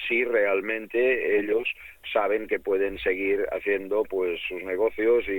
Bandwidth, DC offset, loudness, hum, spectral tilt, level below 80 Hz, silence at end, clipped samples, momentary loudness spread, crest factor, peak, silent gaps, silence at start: 17.5 kHz; under 0.1%; -25 LUFS; none; -5.5 dB/octave; -56 dBFS; 0 s; under 0.1%; 6 LU; 14 dB; -10 dBFS; none; 0 s